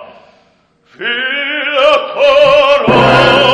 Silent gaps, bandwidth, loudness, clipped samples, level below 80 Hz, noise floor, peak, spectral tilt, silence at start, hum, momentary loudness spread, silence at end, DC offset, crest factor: none; 11 kHz; -9 LUFS; 0.1%; -42 dBFS; -52 dBFS; 0 dBFS; -5 dB/octave; 0 s; none; 8 LU; 0 s; under 0.1%; 10 dB